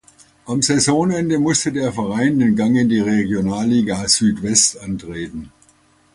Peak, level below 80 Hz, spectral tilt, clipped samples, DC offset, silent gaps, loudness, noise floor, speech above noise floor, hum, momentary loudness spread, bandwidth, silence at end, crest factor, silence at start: 0 dBFS; -48 dBFS; -4 dB/octave; under 0.1%; under 0.1%; none; -17 LUFS; -55 dBFS; 38 dB; none; 13 LU; 11.5 kHz; 0.65 s; 18 dB; 0.45 s